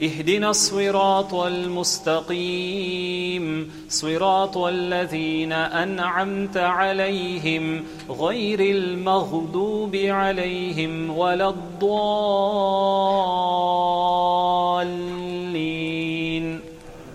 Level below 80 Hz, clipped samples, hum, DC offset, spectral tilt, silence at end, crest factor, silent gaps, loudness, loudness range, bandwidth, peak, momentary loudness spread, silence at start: -54 dBFS; under 0.1%; none; under 0.1%; -4 dB/octave; 0 s; 16 dB; none; -22 LUFS; 3 LU; 16 kHz; -6 dBFS; 6 LU; 0 s